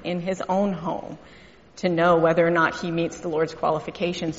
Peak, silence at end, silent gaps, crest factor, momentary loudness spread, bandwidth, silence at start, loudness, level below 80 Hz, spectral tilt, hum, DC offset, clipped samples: -6 dBFS; 0 s; none; 18 dB; 11 LU; 8 kHz; 0 s; -23 LUFS; -56 dBFS; -5 dB/octave; none; under 0.1%; under 0.1%